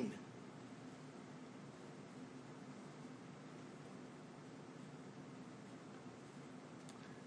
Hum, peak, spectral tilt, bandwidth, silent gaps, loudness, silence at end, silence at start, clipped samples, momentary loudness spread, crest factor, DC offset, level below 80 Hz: none; -30 dBFS; -5.5 dB/octave; 10 kHz; none; -55 LUFS; 0 s; 0 s; under 0.1%; 1 LU; 24 dB; under 0.1%; -88 dBFS